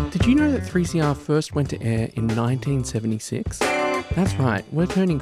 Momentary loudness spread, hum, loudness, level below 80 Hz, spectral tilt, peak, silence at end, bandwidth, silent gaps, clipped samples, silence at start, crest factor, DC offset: 6 LU; none; -22 LUFS; -38 dBFS; -6.5 dB/octave; -6 dBFS; 0 s; 15 kHz; none; under 0.1%; 0 s; 14 dB; under 0.1%